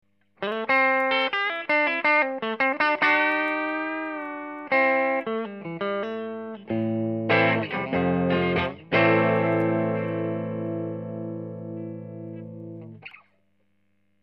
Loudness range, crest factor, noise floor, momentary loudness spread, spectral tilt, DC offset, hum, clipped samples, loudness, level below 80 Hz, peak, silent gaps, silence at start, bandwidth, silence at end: 11 LU; 18 dB; -71 dBFS; 16 LU; -8 dB/octave; under 0.1%; 50 Hz at -60 dBFS; under 0.1%; -24 LUFS; -62 dBFS; -8 dBFS; none; 0.4 s; 6.2 kHz; 1.05 s